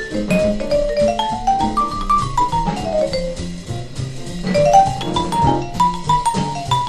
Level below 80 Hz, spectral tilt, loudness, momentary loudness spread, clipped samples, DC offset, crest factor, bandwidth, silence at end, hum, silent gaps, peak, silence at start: -32 dBFS; -5.5 dB/octave; -18 LUFS; 13 LU; under 0.1%; under 0.1%; 16 dB; 13 kHz; 0 s; none; none; 0 dBFS; 0 s